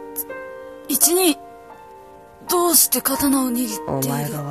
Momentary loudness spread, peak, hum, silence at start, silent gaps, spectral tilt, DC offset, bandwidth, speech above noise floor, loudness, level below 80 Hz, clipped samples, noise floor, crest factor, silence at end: 19 LU; 0 dBFS; none; 0 s; none; -3 dB/octave; under 0.1%; 15 kHz; 24 dB; -18 LUFS; -54 dBFS; under 0.1%; -43 dBFS; 20 dB; 0 s